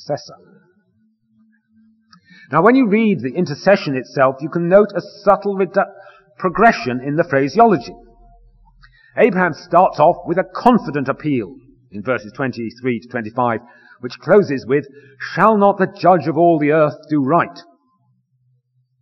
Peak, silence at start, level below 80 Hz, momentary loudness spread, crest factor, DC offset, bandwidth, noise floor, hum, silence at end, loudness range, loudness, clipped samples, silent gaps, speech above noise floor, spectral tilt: 0 dBFS; 0.05 s; -54 dBFS; 12 LU; 16 dB; under 0.1%; 6.2 kHz; -63 dBFS; none; 1.4 s; 5 LU; -16 LUFS; under 0.1%; none; 47 dB; -7.5 dB/octave